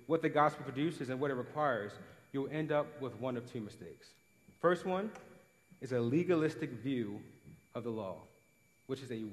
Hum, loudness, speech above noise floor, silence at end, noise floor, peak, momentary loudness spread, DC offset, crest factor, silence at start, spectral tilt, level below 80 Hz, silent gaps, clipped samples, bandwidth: none; -37 LUFS; 34 dB; 0 s; -70 dBFS; -16 dBFS; 17 LU; under 0.1%; 22 dB; 0 s; -7 dB/octave; -78 dBFS; none; under 0.1%; 13 kHz